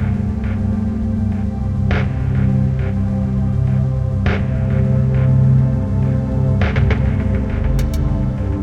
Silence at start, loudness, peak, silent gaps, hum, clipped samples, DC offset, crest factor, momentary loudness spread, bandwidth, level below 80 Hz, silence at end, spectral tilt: 0 s; -17 LUFS; -4 dBFS; none; none; under 0.1%; under 0.1%; 12 dB; 5 LU; 7 kHz; -22 dBFS; 0 s; -9 dB/octave